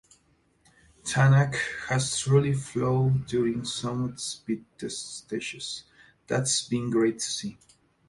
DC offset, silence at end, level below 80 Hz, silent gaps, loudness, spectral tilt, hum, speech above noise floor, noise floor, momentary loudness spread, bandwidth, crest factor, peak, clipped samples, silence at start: under 0.1%; 0.55 s; -58 dBFS; none; -27 LUFS; -5 dB/octave; none; 40 dB; -66 dBFS; 12 LU; 11.5 kHz; 20 dB; -8 dBFS; under 0.1%; 1.05 s